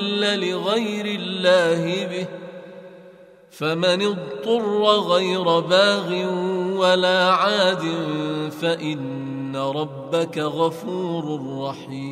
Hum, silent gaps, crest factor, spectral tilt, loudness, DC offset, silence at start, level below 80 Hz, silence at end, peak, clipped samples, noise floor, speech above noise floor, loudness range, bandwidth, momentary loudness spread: none; none; 18 dB; -5 dB/octave; -21 LUFS; under 0.1%; 0 s; -70 dBFS; 0 s; -2 dBFS; under 0.1%; -47 dBFS; 26 dB; 6 LU; 14.5 kHz; 12 LU